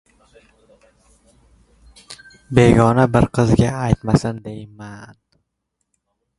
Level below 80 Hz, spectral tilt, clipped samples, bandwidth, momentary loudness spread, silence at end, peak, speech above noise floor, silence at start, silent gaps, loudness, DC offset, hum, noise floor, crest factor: -38 dBFS; -7.5 dB/octave; under 0.1%; 11.5 kHz; 26 LU; 1.35 s; 0 dBFS; 59 dB; 2.1 s; none; -16 LUFS; under 0.1%; none; -75 dBFS; 20 dB